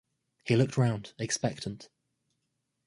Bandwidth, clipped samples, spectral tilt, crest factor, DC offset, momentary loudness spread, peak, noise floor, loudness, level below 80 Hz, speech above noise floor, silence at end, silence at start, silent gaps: 11.5 kHz; under 0.1%; -5.5 dB/octave; 20 dB; under 0.1%; 15 LU; -12 dBFS; -81 dBFS; -30 LUFS; -64 dBFS; 52 dB; 1 s; 0.45 s; none